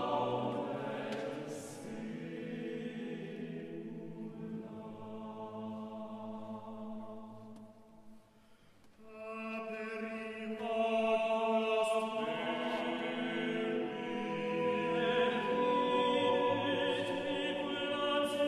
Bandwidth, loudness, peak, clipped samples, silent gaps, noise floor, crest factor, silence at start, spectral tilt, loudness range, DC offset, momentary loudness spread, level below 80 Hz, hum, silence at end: 13 kHz; -36 LUFS; -20 dBFS; under 0.1%; none; -63 dBFS; 16 dB; 0 s; -5 dB/octave; 14 LU; under 0.1%; 15 LU; -72 dBFS; none; 0 s